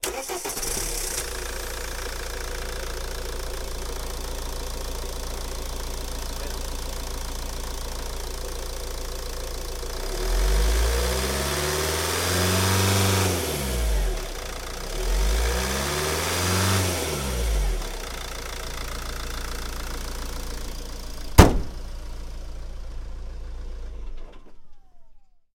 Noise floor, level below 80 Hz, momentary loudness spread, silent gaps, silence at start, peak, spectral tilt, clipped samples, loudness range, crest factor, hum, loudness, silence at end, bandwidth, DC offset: -47 dBFS; -30 dBFS; 17 LU; none; 0 s; 0 dBFS; -3.5 dB/octave; under 0.1%; 10 LU; 26 dB; none; -27 LUFS; 0.3 s; 17 kHz; under 0.1%